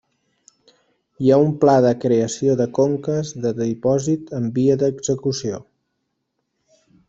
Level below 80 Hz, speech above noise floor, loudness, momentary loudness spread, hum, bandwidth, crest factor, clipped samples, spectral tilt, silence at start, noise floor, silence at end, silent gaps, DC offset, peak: -58 dBFS; 56 dB; -19 LUFS; 9 LU; none; 8 kHz; 18 dB; under 0.1%; -6.5 dB/octave; 1.2 s; -74 dBFS; 1.45 s; none; under 0.1%; -2 dBFS